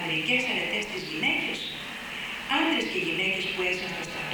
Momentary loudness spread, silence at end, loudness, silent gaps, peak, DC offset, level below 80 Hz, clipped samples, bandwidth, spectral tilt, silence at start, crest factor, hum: 9 LU; 0 s; -27 LUFS; none; -12 dBFS; under 0.1%; -58 dBFS; under 0.1%; 19 kHz; -3 dB/octave; 0 s; 16 dB; none